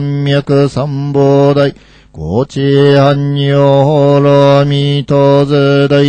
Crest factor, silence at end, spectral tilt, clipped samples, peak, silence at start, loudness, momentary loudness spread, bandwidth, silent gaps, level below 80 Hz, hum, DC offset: 8 dB; 0 s; -8 dB/octave; under 0.1%; 0 dBFS; 0 s; -9 LUFS; 8 LU; 8.6 kHz; none; -42 dBFS; none; under 0.1%